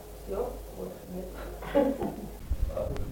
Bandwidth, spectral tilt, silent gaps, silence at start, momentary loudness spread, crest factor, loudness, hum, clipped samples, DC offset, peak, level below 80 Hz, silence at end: 17 kHz; -7 dB/octave; none; 0 s; 13 LU; 22 dB; -34 LUFS; none; under 0.1%; under 0.1%; -12 dBFS; -38 dBFS; 0 s